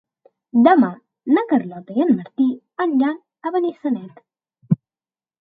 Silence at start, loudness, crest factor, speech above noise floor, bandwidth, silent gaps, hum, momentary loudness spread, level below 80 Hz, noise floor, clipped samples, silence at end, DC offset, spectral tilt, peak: 0.55 s; -20 LUFS; 20 dB; over 72 dB; 4.6 kHz; none; none; 11 LU; -68 dBFS; under -90 dBFS; under 0.1%; 0.7 s; under 0.1%; -11 dB/octave; 0 dBFS